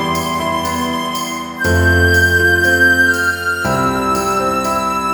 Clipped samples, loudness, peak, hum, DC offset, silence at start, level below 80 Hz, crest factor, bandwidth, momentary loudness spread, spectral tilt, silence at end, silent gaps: under 0.1%; -14 LUFS; -2 dBFS; none; under 0.1%; 0 s; -32 dBFS; 14 dB; over 20 kHz; 8 LU; -4.5 dB/octave; 0 s; none